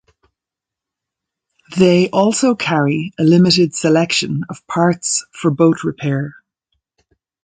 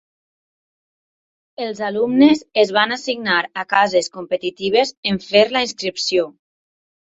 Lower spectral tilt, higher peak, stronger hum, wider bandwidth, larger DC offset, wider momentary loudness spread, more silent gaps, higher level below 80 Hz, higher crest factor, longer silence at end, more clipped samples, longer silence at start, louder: about the same, -5 dB/octave vs -4 dB/octave; about the same, 0 dBFS vs -2 dBFS; neither; first, 9.6 kHz vs 8 kHz; neither; about the same, 10 LU vs 10 LU; second, none vs 4.97-5.03 s; first, -56 dBFS vs -62 dBFS; about the same, 16 dB vs 18 dB; first, 1.1 s vs 0.8 s; neither; about the same, 1.7 s vs 1.6 s; first, -15 LUFS vs -18 LUFS